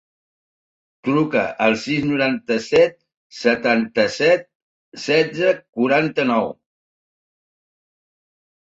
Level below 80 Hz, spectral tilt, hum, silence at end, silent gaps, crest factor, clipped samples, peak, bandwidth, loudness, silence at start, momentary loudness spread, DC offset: -62 dBFS; -5.5 dB/octave; none; 2.2 s; 3.17-3.30 s, 4.55-4.92 s, 5.69-5.73 s; 18 dB; under 0.1%; -2 dBFS; 8 kHz; -19 LUFS; 1.05 s; 5 LU; under 0.1%